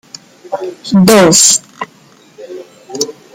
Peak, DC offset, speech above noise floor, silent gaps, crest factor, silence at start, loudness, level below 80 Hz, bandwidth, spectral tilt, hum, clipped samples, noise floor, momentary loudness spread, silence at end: 0 dBFS; under 0.1%; 28 dB; none; 12 dB; 0.5 s; -8 LUFS; -50 dBFS; over 20 kHz; -3.5 dB/octave; none; under 0.1%; -39 dBFS; 25 LU; 0.25 s